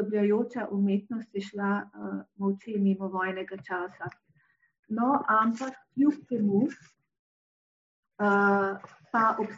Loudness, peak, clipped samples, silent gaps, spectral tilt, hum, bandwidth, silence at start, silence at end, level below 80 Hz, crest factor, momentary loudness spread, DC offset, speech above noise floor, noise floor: -28 LUFS; -12 dBFS; under 0.1%; 4.79-4.83 s, 7.19-8.03 s; -6.5 dB/octave; none; 7.6 kHz; 0 s; 0 s; -78 dBFS; 16 dB; 13 LU; under 0.1%; 40 dB; -68 dBFS